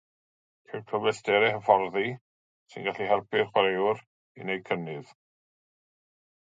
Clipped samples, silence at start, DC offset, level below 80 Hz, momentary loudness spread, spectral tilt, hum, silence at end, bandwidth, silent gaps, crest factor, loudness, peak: under 0.1%; 0.7 s; under 0.1%; -72 dBFS; 17 LU; -5 dB/octave; none; 1.45 s; 9.2 kHz; 2.21-2.66 s, 4.07-4.35 s; 24 dB; -27 LUFS; -4 dBFS